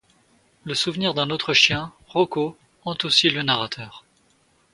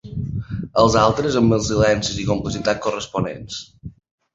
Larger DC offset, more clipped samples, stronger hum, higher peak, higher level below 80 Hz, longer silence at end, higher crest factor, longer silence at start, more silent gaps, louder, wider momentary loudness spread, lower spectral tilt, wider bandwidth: neither; neither; neither; about the same, -2 dBFS vs -2 dBFS; second, -58 dBFS vs -40 dBFS; first, 0.75 s vs 0.45 s; about the same, 22 dB vs 18 dB; first, 0.65 s vs 0.05 s; neither; about the same, -21 LUFS vs -19 LUFS; first, 16 LU vs 13 LU; second, -3.5 dB/octave vs -5.5 dB/octave; first, 11.5 kHz vs 8 kHz